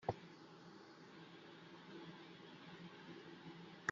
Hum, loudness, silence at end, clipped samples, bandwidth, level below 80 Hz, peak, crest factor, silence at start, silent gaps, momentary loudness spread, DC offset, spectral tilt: none; -56 LUFS; 0 s; under 0.1%; 7.2 kHz; -80 dBFS; -22 dBFS; 30 dB; 0 s; none; 7 LU; under 0.1%; -3.5 dB/octave